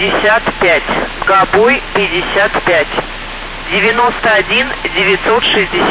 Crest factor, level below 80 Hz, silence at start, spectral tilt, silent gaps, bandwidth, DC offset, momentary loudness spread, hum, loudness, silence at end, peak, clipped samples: 12 dB; -32 dBFS; 0 s; -7.5 dB/octave; none; 4 kHz; under 0.1%; 7 LU; none; -11 LUFS; 0 s; 0 dBFS; under 0.1%